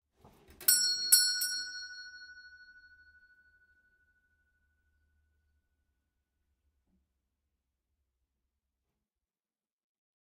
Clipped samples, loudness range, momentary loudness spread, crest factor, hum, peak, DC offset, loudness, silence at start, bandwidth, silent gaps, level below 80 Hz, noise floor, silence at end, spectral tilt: under 0.1%; 21 LU; 23 LU; 30 dB; none; -8 dBFS; under 0.1%; -27 LUFS; 0.6 s; 15.5 kHz; none; -76 dBFS; under -90 dBFS; 7.85 s; 4 dB/octave